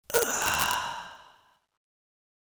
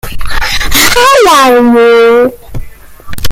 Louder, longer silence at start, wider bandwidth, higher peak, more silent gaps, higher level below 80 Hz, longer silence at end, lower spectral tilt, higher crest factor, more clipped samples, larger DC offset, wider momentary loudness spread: second, -27 LUFS vs -5 LUFS; about the same, 0.1 s vs 0.05 s; about the same, over 20 kHz vs over 20 kHz; about the same, 0 dBFS vs 0 dBFS; neither; second, -58 dBFS vs -20 dBFS; first, 1.3 s vs 0 s; second, -0.5 dB/octave vs -3 dB/octave; first, 32 dB vs 6 dB; second, under 0.1% vs 0.9%; neither; second, 15 LU vs 22 LU